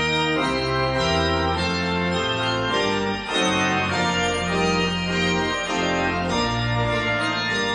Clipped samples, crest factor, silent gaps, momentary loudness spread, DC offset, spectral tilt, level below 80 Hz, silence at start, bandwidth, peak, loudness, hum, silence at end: under 0.1%; 14 dB; none; 2 LU; under 0.1%; -4.5 dB/octave; -40 dBFS; 0 s; 10.5 kHz; -8 dBFS; -22 LUFS; none; 0 s